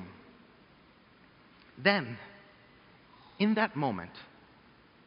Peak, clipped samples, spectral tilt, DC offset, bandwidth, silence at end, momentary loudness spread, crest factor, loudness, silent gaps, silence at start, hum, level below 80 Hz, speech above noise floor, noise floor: -10 dBFS; under 0.1%; -3.5 dB/octave; under 0.1%; 5.4 kHz; 0.8 s; 24 LU; 26 dB; -30 LUFS; none; 0 s; none; -72 dBFS; 30 dB; -60 dBFS